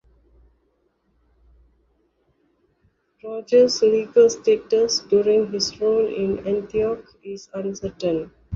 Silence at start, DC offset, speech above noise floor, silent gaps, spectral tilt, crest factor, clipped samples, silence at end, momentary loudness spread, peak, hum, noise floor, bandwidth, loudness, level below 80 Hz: 3.25 s; under 0.1%; 47 dB; none; -4 dB/octave; 18 dB; under 0.1%; 0 s; 16 LU; -4 dBFS; none; -67 dBFS; 7.6 kHz; -20 LUFS; -56 dBFS